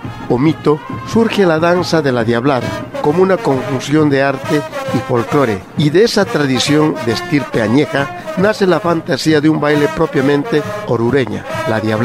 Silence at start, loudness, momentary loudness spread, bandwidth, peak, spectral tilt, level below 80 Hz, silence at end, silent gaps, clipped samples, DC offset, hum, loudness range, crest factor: 0 s; -14 LUFS; 6 LU; 15.5 kHz; 0 dBFS; -6 dB/octave; -44 dBFS; 0 s; none; under 0.1%; under 0.1%; none; 1 LU; 14 dB